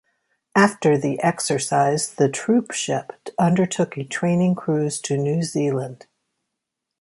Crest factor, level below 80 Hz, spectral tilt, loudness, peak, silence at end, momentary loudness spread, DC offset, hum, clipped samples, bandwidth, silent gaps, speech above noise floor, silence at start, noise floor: 18 dB; -64 dBFS; -5.5 dB/octave; -21 LUFS; -4 dBFS; 1.05 s; 6 LU; under 0.1%; none; under 0.1%; 11.5 kHz; none; 61 dB; 0.55 s; -82 dBFS